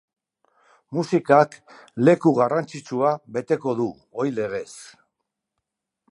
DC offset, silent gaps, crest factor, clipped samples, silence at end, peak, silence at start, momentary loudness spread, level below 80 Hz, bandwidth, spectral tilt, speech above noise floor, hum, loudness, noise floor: under 0.1%; none; 22 dB; under 0.1%; 1.25 s; -2 dBFS; 0.9 s; 13 LU; -70 dBFS; 11.5 kHz; -7 dB/octave; 60 dB; none; -22 LUFS; -82 dBFS